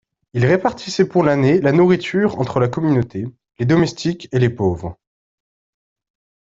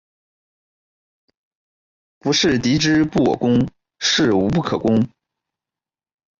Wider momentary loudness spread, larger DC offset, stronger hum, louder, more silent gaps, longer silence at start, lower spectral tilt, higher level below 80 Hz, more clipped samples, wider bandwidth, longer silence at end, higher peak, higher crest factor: first, 12 LU vs 6 LU; neither; neither; about the same, -17 LUFS vs -18 LUFS; neither; second, 0.35 s vs 2.25 s; first, -7 dB/octave vs -4.5 dB/octave; about the same, -50 dBFS vs -48 dBFS; neither; about the same, 7.8 kHz vs 7.6 kHz; first, 1.5 s vs 1.3 s; first, -2 dBFS vs -6 dBFS; about the same, 16 dB vs 14 dB